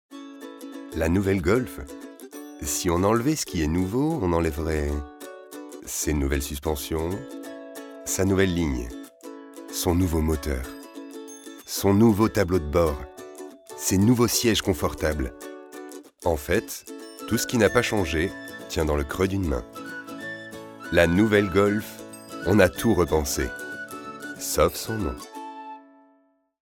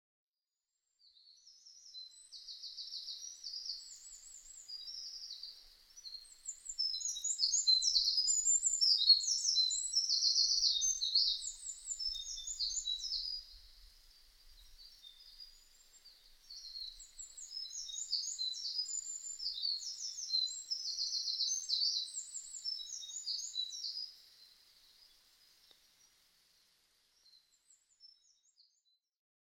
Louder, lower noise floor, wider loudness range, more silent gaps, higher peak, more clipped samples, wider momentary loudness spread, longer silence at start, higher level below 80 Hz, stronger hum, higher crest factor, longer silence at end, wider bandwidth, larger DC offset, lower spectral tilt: first, -24 LUFS vs -34 LUFS; second, -64 dBFS vs under -90 dBFS; second, 5 LU vs 19 LU; neither; first, -4 dBFS vs -16 dBFS; neither; about the same, 20 LU vs 22 LU; second, 0.1 s vs 1.3 s; first, -40 dBFS vs -68 dBFS; neither; about the same, 22 dB vs 24 dB; second, 0.85 s vs 1.35 s; about the same, 19.5 kHz vs 19.5 kHz; neither; first, -5 dB/octave vs 5 dB/octave